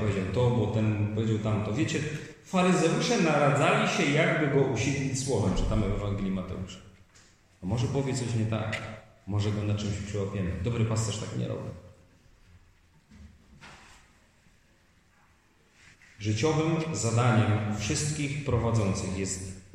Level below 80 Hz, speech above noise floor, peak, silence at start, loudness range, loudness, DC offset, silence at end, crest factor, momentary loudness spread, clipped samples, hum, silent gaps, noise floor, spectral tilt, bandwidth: -46 dBFS; 36 dB; -12 dBFS; 0 s; 9 LU; -28 LUFS; under 0.1%; 0.1 s; 18 dB; 11 LU; under 0.1%; none; none; -63 dBFS; -5.5 dB/octave; 11 kHz